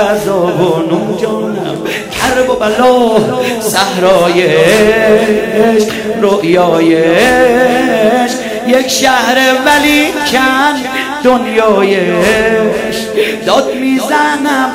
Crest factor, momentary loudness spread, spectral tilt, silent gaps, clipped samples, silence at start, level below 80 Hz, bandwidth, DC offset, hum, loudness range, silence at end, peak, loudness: 10 dB; 7 LU; -4 dB/octave; none; 0.3%; 0 s; -40 dBFS; 16.5 kHz; 0.1%; none; 2 LU; 0 s; 0 dBFS; -10 LUFS